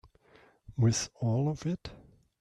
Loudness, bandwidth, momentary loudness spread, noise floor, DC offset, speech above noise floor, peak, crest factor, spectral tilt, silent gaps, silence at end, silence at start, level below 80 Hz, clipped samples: -31 LUFS; 11 kHz; 14 LU; -62 dBFS; under 0.1%; 32 dB; -16 dBFS; 16 dB; -5.5 dB/octave; none; 0.45 s; 0.7 s; -58 dBFS; under 0.1%